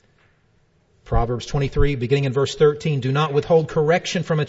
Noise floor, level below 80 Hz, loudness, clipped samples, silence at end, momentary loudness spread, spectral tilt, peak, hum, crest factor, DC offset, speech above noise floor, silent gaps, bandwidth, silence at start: -60 dBFS; -30 dBFS; -20 LUFS; under 0.1%; 0 s; 6 LU; -6.5 dB/octave; -4 dBFS; none; 16 dB; under 0.1%; 41 dB; none; 8 kHz; 1.05 s